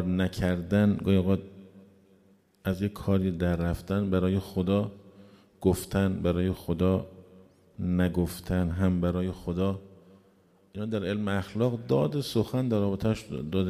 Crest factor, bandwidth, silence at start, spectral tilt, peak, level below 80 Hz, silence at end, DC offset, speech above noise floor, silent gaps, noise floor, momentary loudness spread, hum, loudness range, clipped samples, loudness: 18 dB; 15 kHz; 0 s; -7.5 dB/octave; -10 dBFS; -48 dBFS; 0 s; under 0.1%; 35 dB; none; -62 dBFS; 7 LU; none; 2 LU; under 0.1%; -28 LUFS